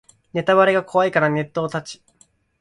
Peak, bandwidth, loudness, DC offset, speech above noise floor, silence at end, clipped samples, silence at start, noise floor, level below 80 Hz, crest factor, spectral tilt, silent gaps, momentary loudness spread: -2 dBFS; 11 kHz; -19 LUFS; under 0.1%; 40 dB; 0.65 s; under 0.1%; 0.35 s; -58 dBFS; -62 dBFS; 18 dB; -6 dB/octave; none; 13 LU